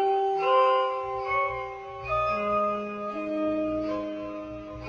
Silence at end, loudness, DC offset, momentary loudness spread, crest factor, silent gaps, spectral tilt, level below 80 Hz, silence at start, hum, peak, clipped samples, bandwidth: 0 s; -27 LUFS; under 0.1%; 14 LU; 16 dB; none; -6.5 dB/octave; -52 dBFS; 0 s; none; -12 dBFS; under 0.1%; 7 kHz